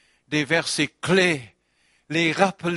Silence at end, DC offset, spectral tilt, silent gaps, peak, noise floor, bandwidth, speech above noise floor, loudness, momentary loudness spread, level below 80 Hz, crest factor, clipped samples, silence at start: 0 s; under 0.1%; -4 dB/octave; none; -2 dBFS; -65 dBFS; 11.5 kHz; 43 dB; -22 LUFS; 8 LU; -60 dBFS; 20 dB; under 0.1%; 0.3 s